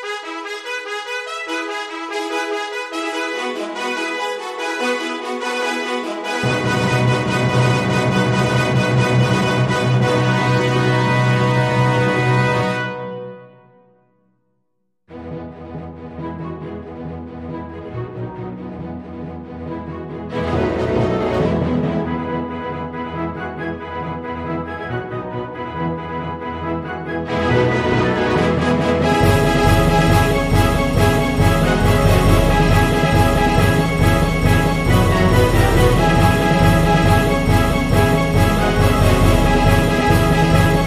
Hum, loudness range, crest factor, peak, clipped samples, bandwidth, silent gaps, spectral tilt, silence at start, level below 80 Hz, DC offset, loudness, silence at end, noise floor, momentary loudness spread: none; 15 LU; 16 dB; 0 dBFS; under 0.1%; 15.5 kHz; none; -6 dB/octave; 0 s; -28 dBFS; under 0.1%; -17 LUFS; 0 s; -72 dBFS; 15 LU